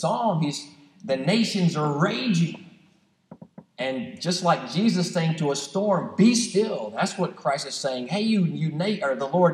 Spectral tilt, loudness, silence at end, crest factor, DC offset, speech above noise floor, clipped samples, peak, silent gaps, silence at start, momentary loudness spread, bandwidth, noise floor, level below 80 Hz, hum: -5.5 dB/octave; -24 LUFS; 0 s; 18 dB; under 0.1%; 38 dB; under 0.1%; -6 dBFS; none; 0 s; 8 LU; 12 kHz; -61 dBFS; -76 dBFS; none